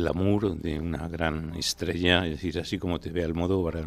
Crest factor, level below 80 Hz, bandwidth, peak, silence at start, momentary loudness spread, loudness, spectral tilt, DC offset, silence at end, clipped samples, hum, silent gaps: 22 dB; -42 dBFS; 14.5 kHz; -6 dBFS; 0 s; 8 LU; -28 LUFS; -5 dB/octave; under 0.1%; 0 s; under 0.1%; none; none